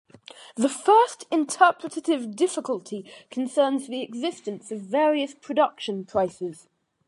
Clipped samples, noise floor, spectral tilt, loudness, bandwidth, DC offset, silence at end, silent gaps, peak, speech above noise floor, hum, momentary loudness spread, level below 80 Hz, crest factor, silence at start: under 0.1%; -48 dBFS; -4 dB/octave; -24 LUFS; 11.5 kHz; under 0.1%; 0.55 s; none; -4 dBFS; 23 dB; none; 16 LU; -70 dBFS; 22 dB; 0.35 s